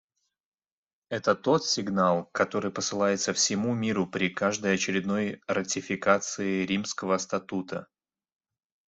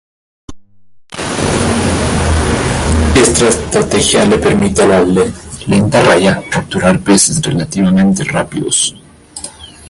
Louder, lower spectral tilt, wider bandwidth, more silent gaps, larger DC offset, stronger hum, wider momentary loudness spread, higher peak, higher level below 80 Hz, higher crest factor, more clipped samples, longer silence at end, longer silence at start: second, -27 LUFS vs -11 LUFS; about the same, -3.5 dB/octave vs -4.5 dB/octave; second, 8.2 kHz vs 11.5 kHz; neither; neither; neither; second, 6 LU vs 10 LU; second, -8 dBFS vs 0 dBFS; second, -68 dBFS vs -24 dBFS; first, 20 dB vs 12 dB; neither; first, 1.05 s vs 0 s; first, 1.1 s vs 0.5 s